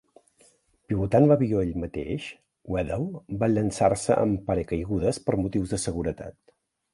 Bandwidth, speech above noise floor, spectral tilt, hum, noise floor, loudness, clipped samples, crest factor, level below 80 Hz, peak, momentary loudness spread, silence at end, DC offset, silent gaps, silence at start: 11.5 kHz; 37 dB; -7 dB/octave; none; -62 dBFS; -26 LUFS; under 0.1%; 20 dB; -46 dBFS; -6 dBFS; 12 LU; 0.65 s; under 0.1%; none; 0.9 s